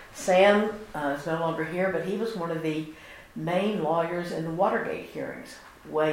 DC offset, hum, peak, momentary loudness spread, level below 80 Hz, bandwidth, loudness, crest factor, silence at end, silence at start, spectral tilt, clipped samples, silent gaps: under 0.1%; none; -8 dBFS; 17 LU; -60 dBFS; 16 kHz; -27 LUFS; 20 dB; 0 s; 0 s; -5.5 dB/octave; under 0.1%; none